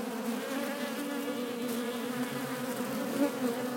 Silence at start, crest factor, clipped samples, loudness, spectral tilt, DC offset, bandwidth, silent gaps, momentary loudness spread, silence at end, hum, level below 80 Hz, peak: 0 s; 16 dB; under 0.1%; -34 LUFS; -4 dB/octave; under 0.1%; 17 kHz; none; 4 LU; 0 s; none; -82 dBFS; -18 dBFS